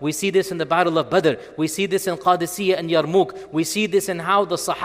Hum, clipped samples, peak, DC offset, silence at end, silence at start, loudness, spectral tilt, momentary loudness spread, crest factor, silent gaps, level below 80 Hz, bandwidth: none; under 0.1%; -4 dBFS; under 0.1%; 0 s; 0 s; -20 LUFS; -4.5 dB/octave; 4 LU; 18 dB; none; -60 dBFS; 16 kHz